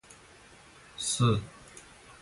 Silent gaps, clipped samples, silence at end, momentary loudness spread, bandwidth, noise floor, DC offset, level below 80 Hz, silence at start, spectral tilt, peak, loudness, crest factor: none; under 0.1%; 0.1 s; 26 LU; 11.5 kHz; -55 dBFS; under 0.1%; -56 dBFS; 0.1 s; -4.5 dB/octave; -14 dBFS; -29 LUFS; 20 dB